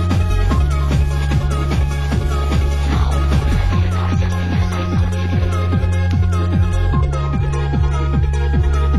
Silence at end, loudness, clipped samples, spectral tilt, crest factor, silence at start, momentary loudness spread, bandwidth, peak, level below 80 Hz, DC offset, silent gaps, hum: 0 s; -18 LUFS; under 0.1%; -7 dB/octave; 12 dB; 0 s; 2 LU; 12 kHz; -4 dBFS; -18 dBFS; 2%; none; none